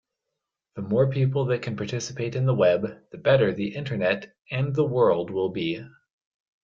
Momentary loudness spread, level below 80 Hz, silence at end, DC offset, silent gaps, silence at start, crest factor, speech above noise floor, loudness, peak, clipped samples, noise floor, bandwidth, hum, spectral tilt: 9 LU; -62 dBFS; 0.75 s; under 0.1%; none; 0.75 s; 18 dB; 60 dB; -25 LUFS; -8 dBFS; under 0.1%; -84 dBFS; 7.6 kHz; none; -6.5 dB/octave